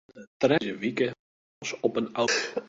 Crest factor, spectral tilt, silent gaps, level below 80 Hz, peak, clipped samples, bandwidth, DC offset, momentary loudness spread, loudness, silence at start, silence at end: 20 dB; -4 dB/octave; 0.27-0.40 s, 1.19-1.61 s; -68 dBFS; -8 dBFS; under 0.1%; 8 kHz; under 0.1%; 7 LU; -28 LUFS; 0.15 s; 0 s